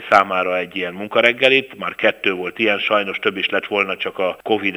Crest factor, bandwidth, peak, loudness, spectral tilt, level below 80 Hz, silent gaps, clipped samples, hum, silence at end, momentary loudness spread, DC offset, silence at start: 18 dB; over 20 kHz; 0 dBFS; -18 LUFS; -4.5 dB/octave; -64 dBFS; none; under 0.1%; none; 0 s; 7 LU; under 0.1%; 0 s